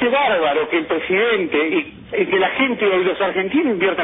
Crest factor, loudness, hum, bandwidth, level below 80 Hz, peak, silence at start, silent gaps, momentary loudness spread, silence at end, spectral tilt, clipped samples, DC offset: 12 dB; -18 LUFS; none; 3.9 kHz; -54 dBFS; -4 dBFS; 0 s; none; 4 LU; 0 s; -8.5 dB/octave; under 0.1%; under 0.1%